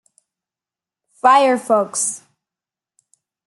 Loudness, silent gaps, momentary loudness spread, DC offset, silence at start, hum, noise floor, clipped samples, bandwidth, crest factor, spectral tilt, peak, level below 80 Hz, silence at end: -16 LUFS; none; 9 LU; under 0.1%; 1.25 s; none; -90 dBFS; under 0.1%; 12.5 kHz; 18 dB; -2 dB/octave; -2 dBFS; -78 dBFS; 1.3 s